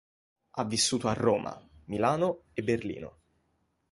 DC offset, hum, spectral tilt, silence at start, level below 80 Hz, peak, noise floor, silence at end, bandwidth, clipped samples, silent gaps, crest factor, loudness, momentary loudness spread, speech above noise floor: under 0.1%; none; -4 dB/octave; 0.55 s; -60 dBFS; -10 dBFS; -74 dBFS; 0.8 s; 11.5 kHz; under 0.1%; none; 20 dB; -29 LUFS; 15 LU; 45 dB